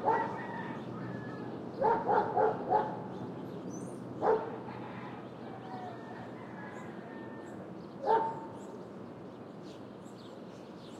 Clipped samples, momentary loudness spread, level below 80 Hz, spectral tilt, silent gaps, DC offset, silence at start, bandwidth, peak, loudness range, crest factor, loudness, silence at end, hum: under 0.1%; 17 LU; -74 dBFS; -7 dB/octave; none; under 0.1%; 0 s; 11 kHz; -16 dBFS; 8 LU; 20 dB; -36 LUFS; 0 s; none